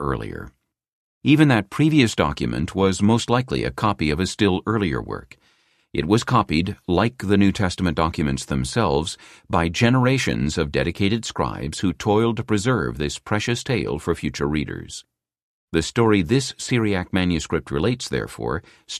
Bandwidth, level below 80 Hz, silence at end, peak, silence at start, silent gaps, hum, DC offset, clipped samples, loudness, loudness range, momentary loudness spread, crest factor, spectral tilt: 14 kHz; -38 dBFS; 0 s; -4 dBFS; 0 s; 0.88-1.21 s, 15.42-15.68 s; none; under 0.1%; under 0.1%; -21 LUFS; 3 LU; 10 LU; 18 dB; -5.5 dB/octave